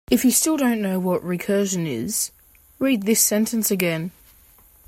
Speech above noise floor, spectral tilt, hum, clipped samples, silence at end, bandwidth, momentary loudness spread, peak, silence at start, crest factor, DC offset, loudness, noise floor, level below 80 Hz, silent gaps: 32 dB; -4 dB/octave; none; under 0.1%; 0.8 s; 16.5 kHz; 8 LU; 0 dBFS; 0.1 s; 22 dB; under 0.1%; -21 LUFS; -52 dBFS; -56 dBFS; none